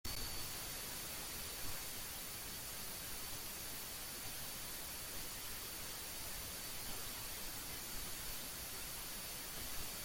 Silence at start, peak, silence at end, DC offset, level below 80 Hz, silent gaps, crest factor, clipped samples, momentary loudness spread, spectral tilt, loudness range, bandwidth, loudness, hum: 0.05 s; -30 dBFS; 0 s; under 0.1%; -58 dBFS; none; 14 dB; under 0.1%; 1 LU; -1.5 dB/octave; 0 LU; 17 kHz; -44 LUFS; none